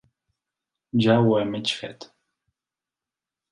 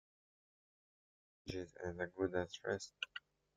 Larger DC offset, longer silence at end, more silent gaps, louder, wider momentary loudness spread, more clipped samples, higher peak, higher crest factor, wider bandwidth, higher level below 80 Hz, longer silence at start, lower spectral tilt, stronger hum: neither; first, 1.45 s vs 0.35 s; neither; first, -22 LUFS vs -44 LUFS; first, 12 LU vs 9 LU; neither; first, -6 dBFS vs -24 dBFS; about the same, 20 dB vs 24 dB; first, 11 kHz vs 9.4 kHz; first, -66 dBFS vs -72 dBFS; second, 0.95 s vs 1.45 s; first, -6.5 dB/octave vs -4.5 dB/octave; neither